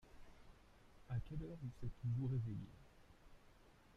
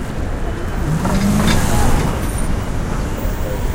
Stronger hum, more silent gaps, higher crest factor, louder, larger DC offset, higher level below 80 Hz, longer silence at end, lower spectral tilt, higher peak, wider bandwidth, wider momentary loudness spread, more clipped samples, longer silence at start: neither; neither; about the same, 16 dB vs 14 dB; second, -46 LUFS vs -19 LUFS; neither; second, -60 dBFS vs -20 dBFS; about the same, 0.05 s vs 0 s; first, -9 dB/octave vs -5.5 dB/octave; second, -32 dBFS vs -2 dBFS; second, 7 kHz vs 16.5 kHz; first, 26 LU vs 8 LU; neither; about the same, 0.05 s vs 0 s